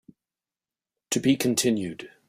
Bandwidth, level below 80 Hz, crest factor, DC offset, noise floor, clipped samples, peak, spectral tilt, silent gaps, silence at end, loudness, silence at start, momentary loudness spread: 16 kHz; -66 dBFS; 18 dB; under 0.1%; under -90 dBFS; under 0.1%; -8 dBFS; -4 dB/octave; none; 0.2 s; -24 LUFS; 1.1 s; 7 LU